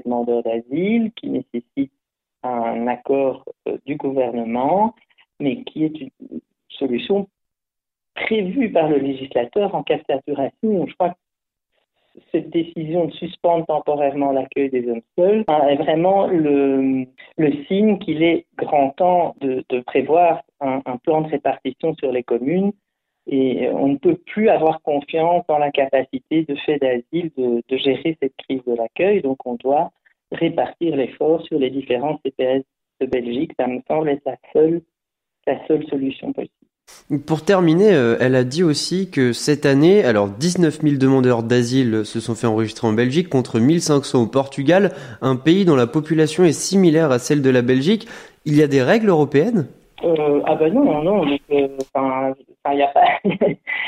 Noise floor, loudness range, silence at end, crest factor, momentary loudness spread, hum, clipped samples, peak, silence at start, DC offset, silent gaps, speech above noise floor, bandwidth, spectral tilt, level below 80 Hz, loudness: -83 dBFS; 7 LU; 0 s; 16 dB; 10 LU; none; under 0.1%; -4 dBFS; 0.05 s; under 0.1%; none; 65 dB; 14.5 kHz; -6 dB/octave; -60 dBFS; -19 LUFS